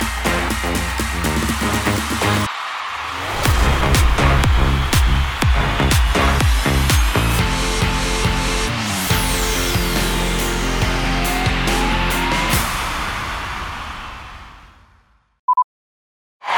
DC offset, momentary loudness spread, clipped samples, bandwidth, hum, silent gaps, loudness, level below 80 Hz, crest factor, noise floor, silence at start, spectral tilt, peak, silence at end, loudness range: under 0.1%; 9 LU; under 0.1%; over 20 kHz; none; 15.39-15.48 s, 15.64-16.40 s; -18 LUFS; -22 dBFS; 16 dB; -55 dBFS; 0 s; -4 dB/octave; -2 dBFS; 0 s; 6 LU